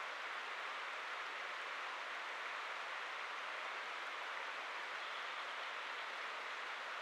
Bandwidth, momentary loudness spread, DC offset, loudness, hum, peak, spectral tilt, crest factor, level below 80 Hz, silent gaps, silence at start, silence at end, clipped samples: 13.5 kHz; 1 LU; under 0.1%; -44 LUFS; none; -32 dBFS; 1 dB/octave; 14 dB; under -90 dBFS; none; 0 s; 0 s; under 0.1%